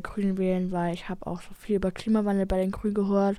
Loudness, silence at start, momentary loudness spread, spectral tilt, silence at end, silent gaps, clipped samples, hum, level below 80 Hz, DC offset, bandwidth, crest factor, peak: -28 LUFS; 0 s; 10 LU; -8 dB/octave; 0 s; none; under 0.1%; none; -44 dBFS; under 0.1%; 12 kHz; 14 dB; -14 dBFS